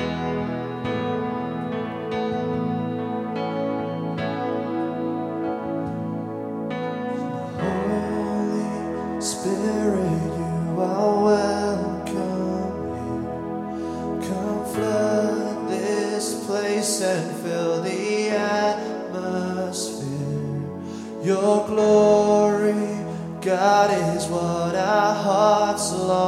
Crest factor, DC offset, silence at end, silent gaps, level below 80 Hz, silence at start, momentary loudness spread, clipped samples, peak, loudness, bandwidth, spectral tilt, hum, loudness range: 18 dB; under 0.1%; 0 s; none; -52 dBFS; 0 s; 10 LU; under 0.1%; -4 dBFS; -24 LUFS; 15 kHz; -5.5 dB/octave; none; 7 LU